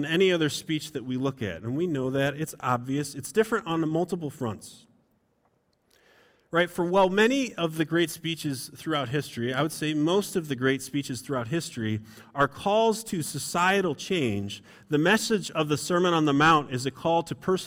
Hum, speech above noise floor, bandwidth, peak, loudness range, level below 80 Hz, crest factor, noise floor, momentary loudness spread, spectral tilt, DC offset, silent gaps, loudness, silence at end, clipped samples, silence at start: none; 43 dB; 17 kHz; -10 dBFS; 5 LU; -62 dBFS; 18 dB; -70 dBFS; 9 LU; -5 dB/octave; under 0.1%; none; -26 LUFS; 0 s; under 0.1%; 0 s